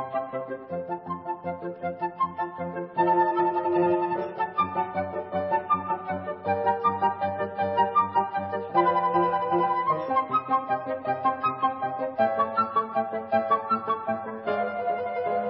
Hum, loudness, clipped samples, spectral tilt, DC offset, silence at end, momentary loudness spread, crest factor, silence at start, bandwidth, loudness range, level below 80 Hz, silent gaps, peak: none; -27 LUFS; under 0.1%; -10.5 dB/octave; under 0.1%; 0 s; 10 LU; 18 dB; 0 s; 5.6 kHz; 3 LU; -60 dBFS; none; -8 dBFS